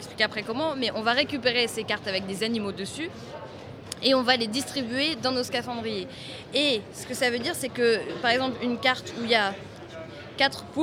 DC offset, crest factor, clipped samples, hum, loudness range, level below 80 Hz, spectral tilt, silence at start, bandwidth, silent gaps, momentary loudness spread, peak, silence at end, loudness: under 0.1%; 20 dB; under 0.1%; none; 2 LU; -62 dBFS; -3.5 dB/octave; 0 s; 16.5 kHz; none; 16 LU; -6 dBFS; 0 s; -26 LUFS